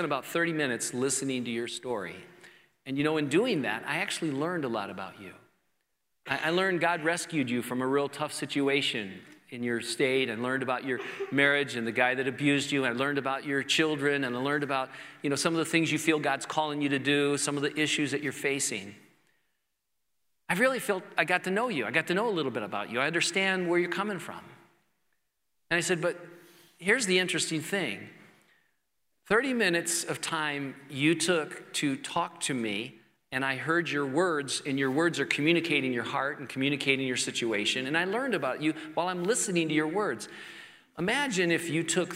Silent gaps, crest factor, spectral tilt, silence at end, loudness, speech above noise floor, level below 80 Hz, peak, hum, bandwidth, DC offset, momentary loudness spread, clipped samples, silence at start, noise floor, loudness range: none; 22 dB; -3.5 dB/octave; 0 s; -29 LUFS; 53 dB; -74 dBFS; -8 dBFS; none; 16 kHz; under 0.1%; 9 LU; under 0.1%; 0 s; -82 dBFS; 3 LU